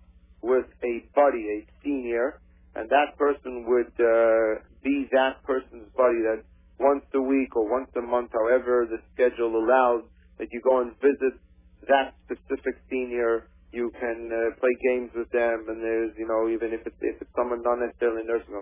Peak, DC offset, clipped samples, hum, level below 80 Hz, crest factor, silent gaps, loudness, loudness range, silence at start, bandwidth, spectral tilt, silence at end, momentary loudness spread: -6 dBFS; under 0.1%; under 0.1%; none; -54 dBFS; 20 dB; none; -26 LUFS; 3 LU; 0.45 s; 3.7 kHz; -8.5 dB/octave; 0 s; 10 LU